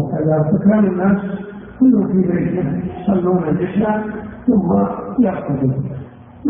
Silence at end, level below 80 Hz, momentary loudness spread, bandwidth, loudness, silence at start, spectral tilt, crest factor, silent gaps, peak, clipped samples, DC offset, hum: 0 s; -44 dBFS; 12 LU; 3.6 kHz; -17 LUFS; 0 s; -14.5 dB/octave; 14 dB; none; -2 dBFS; under 0.1%; under 0.1%; none